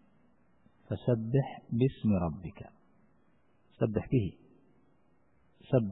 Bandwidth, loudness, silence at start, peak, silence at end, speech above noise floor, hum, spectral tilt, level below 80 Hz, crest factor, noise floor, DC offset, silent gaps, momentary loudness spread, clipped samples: 4 kHz; -32 LUFS; 0.9 s; -14 dBFS; 0 s; 39 dB; none; -12 dB/octave; -56 dBFS; 20 dB; -70 dBFS; under 0.1%; none; 14 LU; under 0.1%